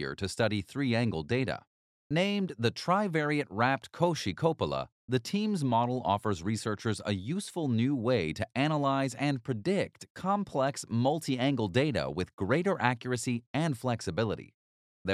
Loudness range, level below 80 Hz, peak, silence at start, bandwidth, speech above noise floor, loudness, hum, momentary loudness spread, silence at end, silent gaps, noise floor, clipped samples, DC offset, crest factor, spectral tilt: 1 LU; -62 dBFS; -10 dBFS; 0 s; 14 kHz; over 60 dB; -31 LUFS; none; 5 LU; 0 s; 1.67-2.10 s, 4.92-5.08 s, 10.10-10.15 s, 12.33-12.38 s, 13.46-13.54 s, 14.54-15.05 s; under -90 dBFS; under 0.1%; under 0.1%; 22 dB; -6 dB/octave